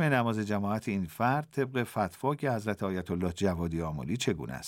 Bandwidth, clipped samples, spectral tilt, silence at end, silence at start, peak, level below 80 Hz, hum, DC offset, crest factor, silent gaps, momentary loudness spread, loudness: 17 kHz; under 0.1%; -6 dB/octave; 0 s; 0 s; -10 dBFS; -54 dBFS; none; under 0.1%; 20 dB; none; 4 LU; -31 LUFS